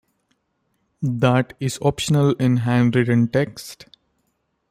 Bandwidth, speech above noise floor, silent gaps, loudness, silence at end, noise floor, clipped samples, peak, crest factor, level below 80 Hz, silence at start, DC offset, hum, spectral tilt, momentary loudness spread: 15 kHz; 52 dB; none; -20 LUFS; 0.95 s; -71 dBFS; under 0.1%; -4 dBFS; 18 dB; -54 dBFS; 1 s; under 0.1%; none; -6.5 dB/octave; 10 LU